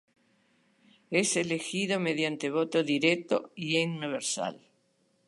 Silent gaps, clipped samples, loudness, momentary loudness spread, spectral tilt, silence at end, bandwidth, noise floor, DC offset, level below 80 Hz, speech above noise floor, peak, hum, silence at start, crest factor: none; under 0.1%; -29 LUFS; 6 LU; -3.5 dB/octave; 0.7 s; 11.5 kHz; -71 dBFS; under 0.1%; -80 dBFS; 42 dB; -10 dBFS; none; 1.1 s; 20 dB